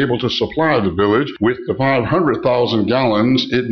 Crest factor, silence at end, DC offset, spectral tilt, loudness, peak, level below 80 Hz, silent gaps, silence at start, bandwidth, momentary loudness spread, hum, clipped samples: 10 dB; 0 s; 0.2%; -7 dB/octave; -16 LUFS; -4 dBFS; -46 dBFS; none; 0 s; 6.6 kHz; 3 LU; none; under 0.1%